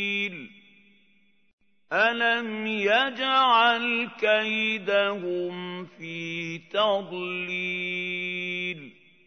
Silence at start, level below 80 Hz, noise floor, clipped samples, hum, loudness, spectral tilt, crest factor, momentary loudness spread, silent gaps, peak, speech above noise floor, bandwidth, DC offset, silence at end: 0 s; -80 dBFS; -66 dBFS; under 0.1%; none; -25 LUFS; -4.5 dB/octave; 18 dB; 12 LU; 1.53-1.58 s; -8 dBFS; 40 dB; 6.6 kHz; under 0.1%; 0.35 s